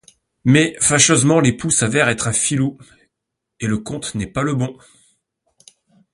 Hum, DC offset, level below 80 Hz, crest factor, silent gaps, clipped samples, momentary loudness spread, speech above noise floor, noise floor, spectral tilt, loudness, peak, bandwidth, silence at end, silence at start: none; under 0.1%; -48 dBFS; 20 dB; none; under 0.1%; 12 LU; 63 dB; -80 dBFS; -4 dB/octave; -17 LUFS; 0 dBFS; 11.5 kHz; 1.4 s; 0.45 s